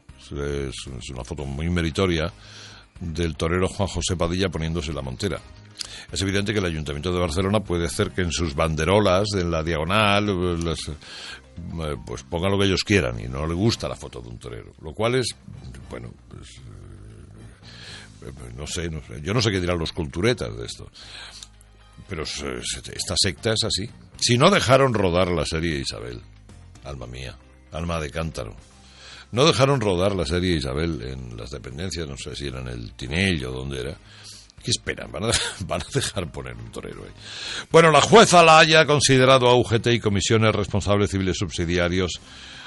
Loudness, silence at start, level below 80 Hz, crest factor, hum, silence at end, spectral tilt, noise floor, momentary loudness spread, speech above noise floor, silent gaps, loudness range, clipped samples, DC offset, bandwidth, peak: -21 LUFS; 0.1 s; -42 dBFS; 20 dB; none; 0 s; -4.5 dB/octave; -50 dBFS; 21 LU; 27 dB; none; 13 LU; under 0.1%; under 0.1%; 11.5 kHz; -4 dBFS